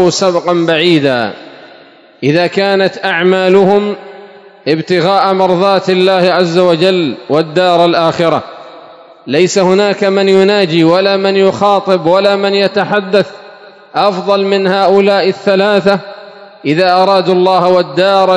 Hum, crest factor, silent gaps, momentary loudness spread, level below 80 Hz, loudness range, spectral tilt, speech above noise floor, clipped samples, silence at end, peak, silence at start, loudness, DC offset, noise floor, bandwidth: none; 10 dB; none; 7 LU; -60 dBFS; 2 LU; -5.5 dB/octave; 29 dB; 1%; 0 s; 0 dBFS; 0 s; -10 LUFS; under 0.1%; -39 dBFS; 11 kHz